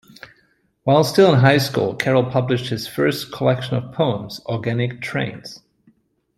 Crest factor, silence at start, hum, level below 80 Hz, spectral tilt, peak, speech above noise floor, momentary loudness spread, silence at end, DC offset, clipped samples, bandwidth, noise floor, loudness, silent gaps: 18 dB; 0.85 s; none; -56 dBFS; -6 dB/octave; -2 dBFS; 43 dB; 13 LU; 0.8 s; under 0.1%; under 0.1%; 14.5 kHz; -62 dBFS; -19 LUFS; none